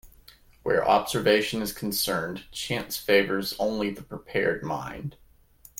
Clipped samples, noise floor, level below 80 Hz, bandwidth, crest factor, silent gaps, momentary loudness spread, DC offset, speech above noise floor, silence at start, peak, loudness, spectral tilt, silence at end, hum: under 0.1%; -55 dBFS; -54 dBFS; 17 kHz; 20 dB; none; 13 LU; under 0.1%; 29 dB; 0.05 s; -6 dBFS; -26 LUFS; -4 dB/octave; 0.7 s; none